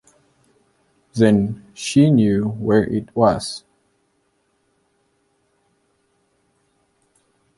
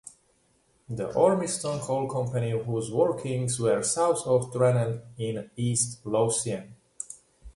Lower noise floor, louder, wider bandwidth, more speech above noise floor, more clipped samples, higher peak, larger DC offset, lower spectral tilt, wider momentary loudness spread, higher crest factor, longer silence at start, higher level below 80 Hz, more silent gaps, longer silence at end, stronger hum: about the same, -66 dBFS vs -67 dBFS; first, -18 LUFS vs -27 LUFS; about the same, 11.5 kHz vs 11.5 kHz; first, 49 dB vs 40 dB; neither; first, -2 dBFS vs -8 dBFS; neither; first, -6.5 dB/octave vs -5 dB/octave; about the same, 14 LU vs 13 LU; about the same, 20 dB vs 20 dB; first, 1.15 s vs 0.05 s; first, -52 dBFS vs -60 dBFS; neither; first, 4 s vs 0.05 s; neither